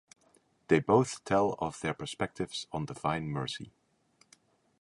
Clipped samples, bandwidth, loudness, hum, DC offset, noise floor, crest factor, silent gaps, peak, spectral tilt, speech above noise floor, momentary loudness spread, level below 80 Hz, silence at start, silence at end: under 0.1%; 11.5 kHz; -32 LUFS; none; under 0.1%; -69 dBFS; 22 dB; none; -10 dBFS; -5.5 dB/octave; 38 dB; 12 LU; -62 dBFS; 0.7 s; 1.1 s